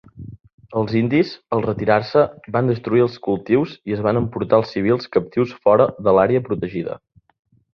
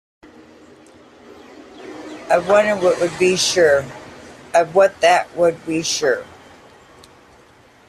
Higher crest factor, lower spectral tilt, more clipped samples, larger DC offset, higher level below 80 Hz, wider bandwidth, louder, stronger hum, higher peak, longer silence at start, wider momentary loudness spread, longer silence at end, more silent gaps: about the same, 18 dB vs 18 dB; first, -9 dB/octave vs -3 dB/octave; neither; neither; first, -50 dBFS vs -58 dBFS; second, 6.4 kHz vs 14.5 kHz; about the same, -19 LUFS vs -17 LUFS; neither; about the same, -2 dBFS vs -2 dBFS; second, 0.15 s vs 1.8 s; second, 10 LU vs 21 LU; second, 0.8 s vs 1.65 s; first, 0.54-0.58 s vs none